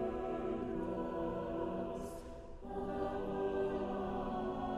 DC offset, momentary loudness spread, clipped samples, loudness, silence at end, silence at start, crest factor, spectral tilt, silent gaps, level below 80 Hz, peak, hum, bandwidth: under 0.1%; 8 LU; under 0.1%; -40 LUFS; 0 s; 0 s; 12 dB; -7.5 dB/octave; none; -54 dBFS; -26 dBFS; none; 13 kHz